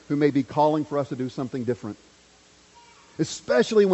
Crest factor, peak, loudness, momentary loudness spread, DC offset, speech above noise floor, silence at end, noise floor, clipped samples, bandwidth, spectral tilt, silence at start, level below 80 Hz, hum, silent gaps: 18 dB; -8 dBFS; -25 LUFS; 13 LU; under 0.1%; 32 dB; 0 s; -55 dBFS; under 0.1%; 8.2 kHz; -6 dB/octave; 0.1 s; -64 dBFS; none; none